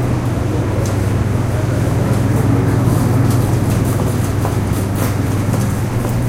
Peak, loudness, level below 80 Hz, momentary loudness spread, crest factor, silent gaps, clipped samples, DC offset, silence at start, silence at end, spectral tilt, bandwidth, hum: -2 dBFS; -16 LUFS; -28 dBFS; 4 LU; 12 dB; none; under 0.1%; under 0.1%; 0 s; 0 s; -7 dB/octave; 16.5 kHz; none